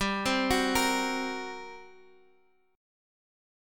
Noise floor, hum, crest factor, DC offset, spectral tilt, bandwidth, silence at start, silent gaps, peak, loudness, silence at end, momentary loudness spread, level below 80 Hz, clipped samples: -67 dBFS; none; 20 dB; under 0.1%; -3 dB/octave; 17.5 kHz; 0 s; none; -14 dBFS; -28 LUFS; 1 s; 18 LU; -52 dBFS; under 0.1%